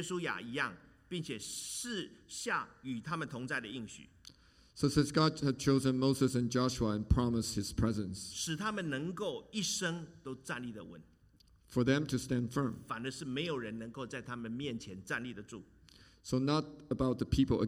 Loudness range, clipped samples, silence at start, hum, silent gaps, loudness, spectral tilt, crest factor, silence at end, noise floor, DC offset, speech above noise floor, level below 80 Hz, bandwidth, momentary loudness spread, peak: 8 LU; under 0.1%; 0 s; none; none; -36 LUFS; -5 dB/octave; 20 dB; 0 s; -65 dBFS; under 0.1%; 30 dB; -52 dBFS; 16 kHz; 14 LU; -16 dBFS